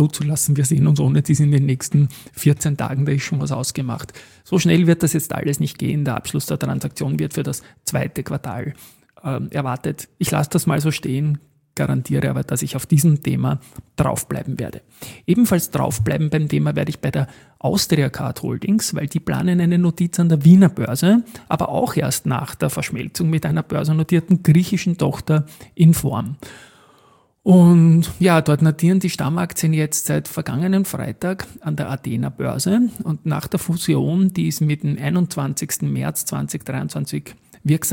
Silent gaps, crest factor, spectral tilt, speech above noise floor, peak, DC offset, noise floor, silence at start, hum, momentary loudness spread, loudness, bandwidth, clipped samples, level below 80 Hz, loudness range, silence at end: none; 18 dB; -6 dB/octave; 36 dB; -2 dBFS; under 0.1%; -55 dBFS; 0 s; none; 11 LU; -19 LUFS; 17 kHz; under 0.1%; -48 dBFS; 6 LU; 0 s